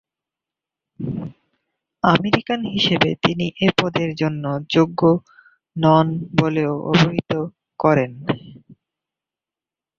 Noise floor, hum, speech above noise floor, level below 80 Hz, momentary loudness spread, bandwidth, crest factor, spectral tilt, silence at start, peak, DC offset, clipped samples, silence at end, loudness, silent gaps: -89 dBFS; none; 71 dB; -54 dBFS; 12 LU; 7.4 kHz; 20 dB; -6.5 dB/octave; 1 s; 0 dBFS; under 0.1%; under 0.1%; 1.25 s; -19 LUFS; none